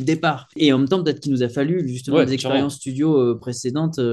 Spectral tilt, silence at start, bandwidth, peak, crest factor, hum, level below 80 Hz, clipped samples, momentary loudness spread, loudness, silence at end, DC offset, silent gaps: -6 dB/octave; 0 s; 12.5 kHz; -2 dBFS; 16 dB; none; -60 dBFS; under 0.1%; 5 LU; -20 LUFS; 0 s; under 0.1%; none